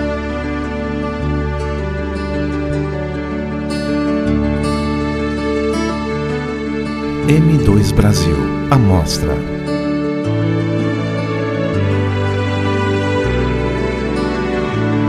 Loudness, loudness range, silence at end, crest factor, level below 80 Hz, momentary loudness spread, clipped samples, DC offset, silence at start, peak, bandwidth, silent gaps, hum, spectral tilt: -17 LUFS; 5 LU; 0 s; 16 dB; -26 dBFS; 8 LU; under 0.1%; under 0.1%; 0 s; 0 dBFS; 14.5 kHz; none; none; -6.5 dB/octave